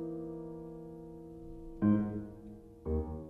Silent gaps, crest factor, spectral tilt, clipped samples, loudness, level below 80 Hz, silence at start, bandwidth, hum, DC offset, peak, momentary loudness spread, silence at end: none; 20 dB; -11 dB/octave; under 0.1%; -36 LUFS; -48 dBFS; 0 s; 3.3 kHz; none; under 0.1%; -18 dBFS; 19 LU; 0 s